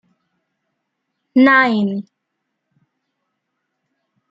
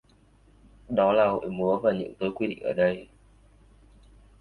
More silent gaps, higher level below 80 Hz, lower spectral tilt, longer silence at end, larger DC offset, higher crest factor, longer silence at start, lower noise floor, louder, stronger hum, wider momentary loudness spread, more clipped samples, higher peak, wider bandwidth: neither; second, -68 dBFS vs -58 dBFS; about the same, -7.5 dB/octave vs -8 dB/octave; first, 2.3 s vs 1.35 s; neither; about the same, 20 dB vs 18 dB; first, 1.35 s vs 0.9 s; first, -76 dBFS vs -59 dBFS; first, -14 LUFS vs -26 LUFS; second, none vs 50 Hz at -55 dBFS; first, 12 LU vs 8 LU; neither; first, -2 dBFS vs -10 dBFS; first, 5.4 kHz vs 4.7 kHz